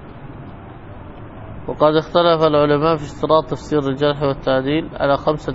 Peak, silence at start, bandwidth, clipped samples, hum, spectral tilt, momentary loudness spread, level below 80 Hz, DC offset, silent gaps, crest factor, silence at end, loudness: 0 dBFS; 0 s; 8 kHz; under 0.1%; none; -7 dB/octave; 22 LU; -40 dBFS; under 0.1%; none; 18 dB; 0 s; -17 LUFS